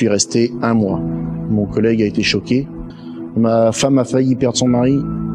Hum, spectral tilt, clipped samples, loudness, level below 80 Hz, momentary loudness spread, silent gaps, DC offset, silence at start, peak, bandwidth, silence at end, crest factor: none; -5 dB/octave; under 0.1%; -16 LUFS; -40 dBFS; 9 LU; none; under 0.1%; 0 s; -2 dBFS; 11.5 kHz; 0 s; 14 dB